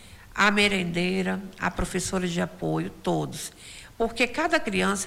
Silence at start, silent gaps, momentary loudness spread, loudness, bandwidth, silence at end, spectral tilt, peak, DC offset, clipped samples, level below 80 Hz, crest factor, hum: 0 s; none; 13 LU; -26 LUFS; 16 kHz; 0 s; -4 dB/octave; -10 dBFS; under 0.1%; under 0.1%; -46 dBFS; 18 dB; none